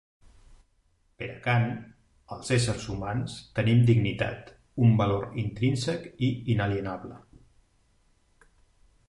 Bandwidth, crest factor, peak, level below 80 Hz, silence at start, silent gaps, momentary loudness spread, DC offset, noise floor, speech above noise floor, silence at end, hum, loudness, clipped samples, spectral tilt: 11.5 kHz; 18 dB; -10 dBFS; -52 dBFS; 0.5 s; none; 17 LU; under 0.1%; -67 dBFS; 41 dB; 1.9 s; none; -27 LUFS; under 0.1%; -6.5 dB/octave